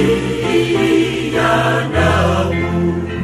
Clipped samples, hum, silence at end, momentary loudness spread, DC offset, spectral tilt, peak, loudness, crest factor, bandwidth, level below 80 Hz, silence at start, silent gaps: under 0.1%; none; 0 s; 4 LU; under 0.1%; -6 dB/octave; -2 dBFS; -15 LUFS; 14 dB; 14 kHz; -32 dBFS; 0 s; none